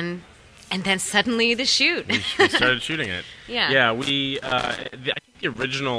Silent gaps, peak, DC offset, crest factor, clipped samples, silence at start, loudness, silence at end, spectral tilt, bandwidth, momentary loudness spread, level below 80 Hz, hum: none; -2 dBFS; under 0.1%; 20 dB; under 0.1%; 0 s; -21 LUFS; 0 s; -3 dB/octave; 11 kHz; 11 LU; -52 dBFS; none